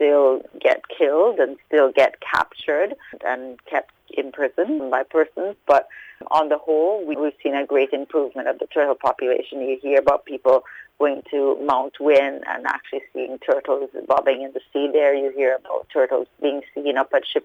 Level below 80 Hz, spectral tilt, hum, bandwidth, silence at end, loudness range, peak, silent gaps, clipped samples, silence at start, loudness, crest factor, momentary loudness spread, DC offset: -62 dBFS; -5 dB/octave; none; 7.8 kHz; 0.05 s; 3 LU; -6 dBFS; none; under 0.1%; 0 s; -21 LUFS; 14 dB; 9 LU; under 0.1%